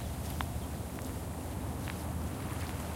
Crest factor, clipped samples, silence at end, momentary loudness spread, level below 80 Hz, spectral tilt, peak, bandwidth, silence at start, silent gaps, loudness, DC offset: 22 dB; under 0.1%; 0 s; 2 LU; -44 dBFS; -5.5 dB/octave; -16 dBFS; 17 kHz; 0 s; none; -39 LUFS; under 0.1%